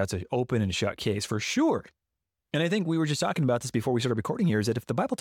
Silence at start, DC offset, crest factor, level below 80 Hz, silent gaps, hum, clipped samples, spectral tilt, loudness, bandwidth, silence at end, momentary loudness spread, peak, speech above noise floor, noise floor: 0 s; under 0.1%; 12 dB; -58 dBFS; none; none; under 0.1%; -5.5 dB/octave; -28 LUFS; 17 kHz; 0.05 s; 4 LU; -14 dBFS; 59 dB; -86 dBFS